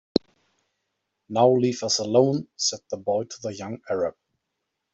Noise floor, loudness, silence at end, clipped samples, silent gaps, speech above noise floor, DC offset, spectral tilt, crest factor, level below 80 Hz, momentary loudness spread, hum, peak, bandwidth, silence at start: -81 dBFS; -24 LUFS; 0.85 s; under 0.1%; none; 57 dB; under 0.1%; -4.5 dB/octave; 22 dB; -62 dBFS; 13 LU; none; -4 dBFS; 8.2 kHz; 0.15 s